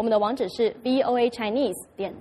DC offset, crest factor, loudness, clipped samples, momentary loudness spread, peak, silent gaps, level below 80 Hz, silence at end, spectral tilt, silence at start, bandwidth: under 0.1%; 14 dB; -25 LUFS; under 0.1%; 7 LU; -10 dBFS; none; -62 dBFS; 0 s; -5 dB/octave; 0 s; 13.5 kHz